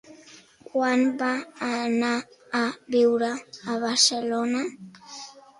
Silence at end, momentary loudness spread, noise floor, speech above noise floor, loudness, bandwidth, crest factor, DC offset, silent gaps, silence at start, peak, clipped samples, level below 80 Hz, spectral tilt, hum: 0.2 s; 16 LU; -51 dBFS; 27 dB; -25 LUFS; 11.5 kHz; 20 dB; under 0.1%; none; 0.1 s; -6 dBFS; under 0.1%; -72 dBFS; -2 dB/octave; none